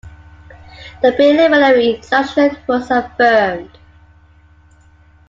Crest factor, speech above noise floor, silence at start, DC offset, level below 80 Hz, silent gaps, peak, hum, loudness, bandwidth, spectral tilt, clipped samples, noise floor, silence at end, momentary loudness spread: 14 dB; 34 dB; 0.05 s; under 0.1%; -46 dBFS; none; 0 dBFS; none; -13 LUFS; 7.6 kHz; -5.5 dB/octave; under 0.1%; -47 dBFS; 1.6 s; 8 LU